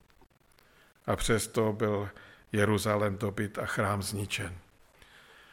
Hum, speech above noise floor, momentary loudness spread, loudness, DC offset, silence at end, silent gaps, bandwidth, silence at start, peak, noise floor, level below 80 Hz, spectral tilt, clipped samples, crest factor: none; 33 dB; 9 LU; -31 LUFS; under 0.1%; 0.9 s; none; 17 kHz; 1.05 s; -12 dBFS; -63 dBFS; -50 dBFS; -5 dB/octave; under 0.1%; 20 dB